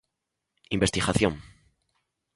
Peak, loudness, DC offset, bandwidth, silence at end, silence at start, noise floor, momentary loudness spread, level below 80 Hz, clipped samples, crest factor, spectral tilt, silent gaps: -6 dBFS; -26 LUFS; under 0.1%; 11.5 kHz; 0.9 s; 0.7 s; -83 dBFS; 10 LU; -46 dBFS; under 0.1%; 24 dB; -4.5 dB/octave; none